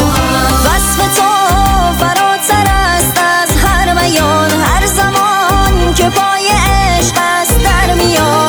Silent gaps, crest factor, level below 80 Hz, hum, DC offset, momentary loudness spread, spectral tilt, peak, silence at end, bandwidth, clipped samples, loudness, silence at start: none; 10 dB; -18 dBFS; none; under 0.1%; 1 LU; -3.5 dB/octave; 0 dBFS; 0 s; over 20 kHz; under 0.1%; -10 LUFS; 0 s